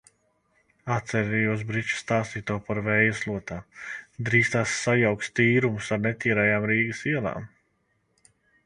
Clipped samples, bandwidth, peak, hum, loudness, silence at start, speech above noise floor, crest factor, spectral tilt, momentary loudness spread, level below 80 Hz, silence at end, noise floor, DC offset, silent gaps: under 0.1%; 10.5 kHz; -6 dBFS; none; -25 LUFS; 0.85 s; 46 dB; 20 dB; -5.5 dB/octave; 13 LU; -56 dBFS; 1.2 s; -71 dBFS; under 0.1%; none